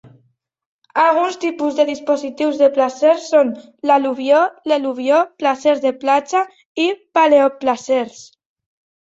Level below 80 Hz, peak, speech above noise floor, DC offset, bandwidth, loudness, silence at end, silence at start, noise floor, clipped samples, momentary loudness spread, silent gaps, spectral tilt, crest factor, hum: -68 dBFS; -2 dBFS; 46 dB; under 0.1%; 8 kHz; -17 LUFS; 0.9 s; 0.95 s; -62 dBFS; under 0.1%; 7 LU; 6.66-6.75 s; -3.5 dB/octave; 16 dB; none